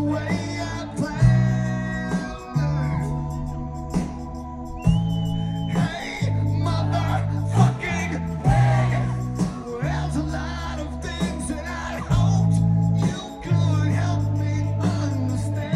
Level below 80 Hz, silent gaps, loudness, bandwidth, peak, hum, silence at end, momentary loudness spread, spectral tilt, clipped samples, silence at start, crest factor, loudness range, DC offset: -34 dBFS; none; -23 LUFS; 12 kHz; -4 dBFS; none; 0 s; 10 LU; -7 dB/octave; under 0.1%; 0 s; 18 dB; 4 LU; under 0.1%